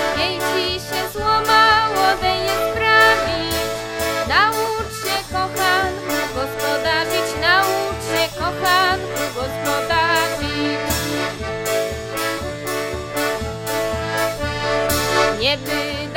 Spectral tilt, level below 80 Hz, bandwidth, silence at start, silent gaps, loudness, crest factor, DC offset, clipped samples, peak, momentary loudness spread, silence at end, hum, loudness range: -3 dB/octave; -40 dBFS; 17 kHz; 0 s; none; -19 LUFS; 18 dB; under 0.1%; under 0.1%; -2 dBFS; 9 LU; 0 s; none; 6 LU